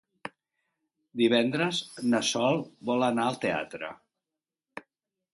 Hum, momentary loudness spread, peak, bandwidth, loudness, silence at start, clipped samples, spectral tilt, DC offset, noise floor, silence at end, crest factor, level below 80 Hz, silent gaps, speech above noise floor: none; 20 LU; -10 dBFS; 11.5 kHz; -27 LUFS; 0.25 s; under 0.1%; -4 dB/octave; under 0.1%; -90 dBFS; 0.55 s; 20 dB; -72 dBFS; none; 62 dB